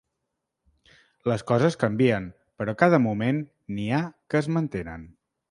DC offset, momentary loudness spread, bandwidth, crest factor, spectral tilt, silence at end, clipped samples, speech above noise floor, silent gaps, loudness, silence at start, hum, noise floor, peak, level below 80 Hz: under 0.1%; 14 LU; 11 kHz; 24 dB; -7.5 dB/octave; 0.4 s; under 0.1%; 57 dB; none; -25 LUFS; 1.25 s; none; -81 dBFS; -2 dBFS; -56 dBFS